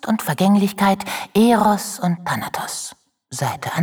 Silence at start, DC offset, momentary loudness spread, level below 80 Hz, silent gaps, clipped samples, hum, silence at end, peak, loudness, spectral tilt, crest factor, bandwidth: 0.05 s; under 0.1%; 11 LU; -56 dBFS; none; under 0.1%; none; 0 s; -4 dBFS; -19 LUFS; -5 dB/octave; 14 dB; over 20 kHz